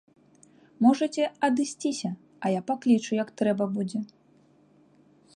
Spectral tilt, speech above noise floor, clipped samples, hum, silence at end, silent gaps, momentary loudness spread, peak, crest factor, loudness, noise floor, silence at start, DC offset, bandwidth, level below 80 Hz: -5.5 dB/octave; 35 dB; under 0.1%; none; 1.3 s; none; 10 LU; -8 dBFS; 18 dB; -27 LUFS; -60 dBFS; 0.8 s; under 0.1%; 11 kHz; -74 dBFS